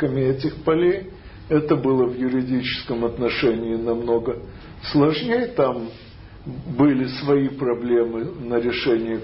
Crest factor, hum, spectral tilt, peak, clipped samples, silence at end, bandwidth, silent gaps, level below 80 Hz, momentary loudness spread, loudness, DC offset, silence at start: 16 dB; none; -11 dB/octave; -6 dBFS; under 0.1%; 0 s; 5.8 kHz; none; -46 dBFS; 15 LU; -21 LUFS; under 0.1%; 0 s